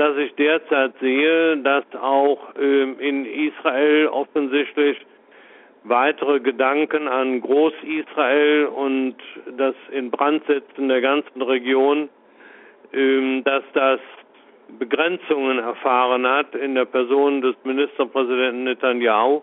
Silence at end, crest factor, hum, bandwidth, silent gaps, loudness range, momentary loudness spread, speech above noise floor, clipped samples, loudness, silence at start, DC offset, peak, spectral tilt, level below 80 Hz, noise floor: 0 s; 16 dB; none; 4 kHz; none; 2 LU; 7 LU; 30 dB; under 0.1%; -20 LUFS; 0 s; under 0.1%; -4 dBFS; -0.5 dB/octave; -72 dBFS; -50 dBFS